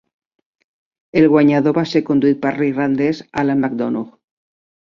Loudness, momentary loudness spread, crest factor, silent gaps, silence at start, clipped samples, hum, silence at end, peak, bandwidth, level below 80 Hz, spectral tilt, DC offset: -16 LUFS; 9 LU; 16 dB; none; 1.15 s; under 0.1%; none; 0.8 s; -2 dBFS; 7.2 kHz; -58 dBFS; -8 dB/octave; under 0.1%